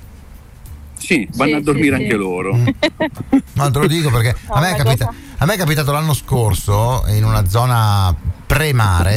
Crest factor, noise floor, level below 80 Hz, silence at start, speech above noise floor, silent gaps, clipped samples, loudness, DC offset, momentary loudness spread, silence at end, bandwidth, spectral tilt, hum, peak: 12 dB; -37 dBFS; -28 dBFS; 0 s; 23 dB; none; under 0.1%; -16 LUFS; under 0.1%; 4 LU; 0 s; 16.5 kHz; -5.5 dB/octave; none; -4 dBFS